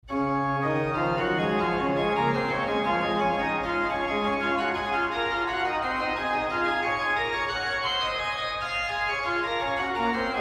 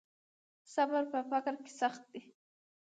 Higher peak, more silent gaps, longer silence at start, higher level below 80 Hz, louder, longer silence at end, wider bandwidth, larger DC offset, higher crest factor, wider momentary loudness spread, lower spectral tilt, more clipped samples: first, -14 dBFS vs -20 dBFS; neither; second, 0.05 s vs 0.7 s; first, -50 dBFS vs under -90 dBFS; first, -26 LUFS vs -36 LUFS; second, 0 s vs 0.75 s; first, 13 kHz vs 9.4 kHz; neither; about the same, 14 dB vs 18 dB; second, 2 LU vs 18 LU; first, -5.5 dB/octave vs -3 dB/octave; neither